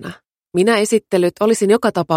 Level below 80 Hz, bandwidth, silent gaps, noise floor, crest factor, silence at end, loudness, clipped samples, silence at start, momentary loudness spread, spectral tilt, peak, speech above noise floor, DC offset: -60 dBFS; 16 kHz; none; -35 dBFS; 16 dB; 0 s; -16 LUFS; under 0.1%; 0 s; 6 LU; -5 dB/octave; -2 dBFS; 20 dB; under 0.1%